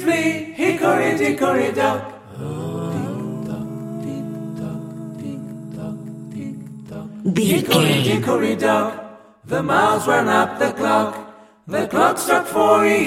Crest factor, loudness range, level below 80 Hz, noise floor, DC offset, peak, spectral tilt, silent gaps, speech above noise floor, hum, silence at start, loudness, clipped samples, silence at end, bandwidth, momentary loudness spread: 18 dB; 12 LU; -60 dBFS; -40 dBFS; under 0.1%; -2 dBFS; -5 dB/octave; none; 22 dB; none; 0 s; -19 LUFS; under 0.1%; 0 s; 16.5 kHz; 16 LU